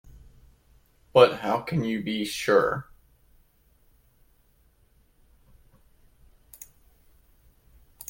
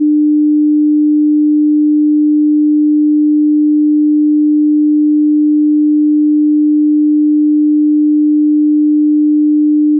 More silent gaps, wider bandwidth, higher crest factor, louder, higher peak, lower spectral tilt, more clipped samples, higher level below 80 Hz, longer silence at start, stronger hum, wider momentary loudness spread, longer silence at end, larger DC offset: neither; first, 17 kHz vs 0.4 kHz; first, 26 dB vs 4 dB; second, -24 LUFS vs -10 LUFS; about the same, -4 dBFS vs -6 dBFS; second, -5 dB/octave vs -16.5 dB/octave; neither; first, -58 dBFS vs under -90 dBFS; first, 0.15 s vs 0 s; second, none vs 50 Hz at -105 dBFS; first, 27 LU vs 0 LU; first, 5.25 s vs 0 s; neither